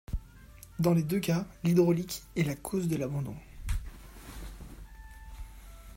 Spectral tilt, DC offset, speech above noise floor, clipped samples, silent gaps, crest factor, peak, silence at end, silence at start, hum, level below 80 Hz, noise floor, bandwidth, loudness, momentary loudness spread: -6.5 dB/octave; under 0.1%; 23 dB; under 0.1%; none; 20 dB; -12 dBFS; 0 s; 0.1 s; none; -44 dBFS; -52 dBFS; 16 kHz; -31 LUFS; 23 LU